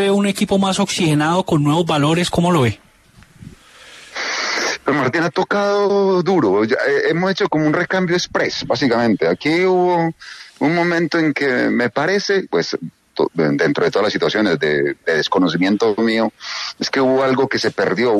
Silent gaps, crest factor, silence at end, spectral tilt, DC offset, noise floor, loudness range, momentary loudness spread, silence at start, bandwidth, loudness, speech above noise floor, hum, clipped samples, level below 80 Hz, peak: none; 14 dB; 0 s; -5 dB/octave; under 0.1%; -48 dBFS; 3 LU; 5 LU; 0 s; 13 kHz; -17 LUFS; 32 dB; none; under 0.1%; -52 dBFS; -2 dBFS